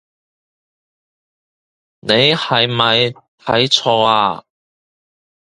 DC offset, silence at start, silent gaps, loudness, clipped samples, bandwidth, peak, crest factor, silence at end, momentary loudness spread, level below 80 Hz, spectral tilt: under 0.1%; 2.05 s; 3.28-3.38 s; -14 LUFS; under 0.1%; 11.5 kHz; 0 dBFS; 18 dB; 1.15 s; 11 LU; -56 dBFS; -4 dB/octave